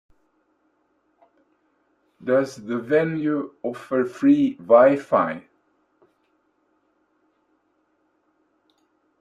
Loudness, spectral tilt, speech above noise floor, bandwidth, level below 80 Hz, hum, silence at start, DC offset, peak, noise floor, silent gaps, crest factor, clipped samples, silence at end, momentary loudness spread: -21 LUFS; -7.5 dB/octave; 48 dB; 10 kHz; -72 dBFS; 50 Hz at -60 dBFS; 2.2 s; under 0.1%; -2 dBFS; -68 dBFS; none; 22 dB; under 0.1%; 3.8 s; 15 LU